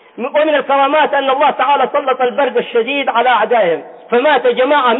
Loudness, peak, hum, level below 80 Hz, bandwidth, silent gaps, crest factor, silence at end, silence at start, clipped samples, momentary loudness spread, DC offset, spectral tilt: -13 LUFS; -2 dBFS; none; -66 dBFS; 4.1 kHz; none; 10 dB; 0 s; 0.15 s; under 0.1%; 4 LU; under 0.1%; -7.5 dB/octave